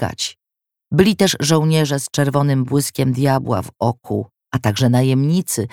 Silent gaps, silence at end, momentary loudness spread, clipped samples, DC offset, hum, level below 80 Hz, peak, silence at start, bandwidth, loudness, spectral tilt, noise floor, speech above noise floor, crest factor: none; 0.05 s; 10 LU; under 0.1%; 0.1%; none; -50 dBFS; 0 dBFS; 0 s; 17.5 kHz; -18 LUFS; -5.5 dB/octave; -84 dBFS; 67 dB; 18 dB